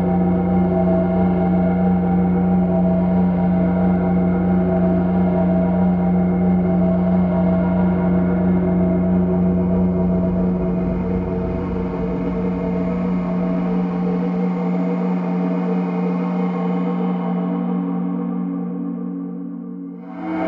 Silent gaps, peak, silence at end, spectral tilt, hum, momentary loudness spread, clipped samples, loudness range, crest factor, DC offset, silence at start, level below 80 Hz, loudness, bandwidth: none; -6 dBFS; 0 s; -12 dB/octave; none; 6 LU; under 0.1%; 4 LU; 10 dB; under 0.1%; 0 s; -36 dBFS; -19 LUFS; 3.4 kHz